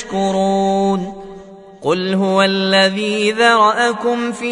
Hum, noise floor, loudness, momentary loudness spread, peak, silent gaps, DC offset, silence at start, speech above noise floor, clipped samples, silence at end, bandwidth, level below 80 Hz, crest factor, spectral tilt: none; -37 dBFS; -15 LUFS; 10 LU; 0 dBFS; none; under 0.1%; 0 s; 22 dB; under 0.1%; 0 s; 11 kHz; -52 dBFS; 16 dB; -4.5 dB/octave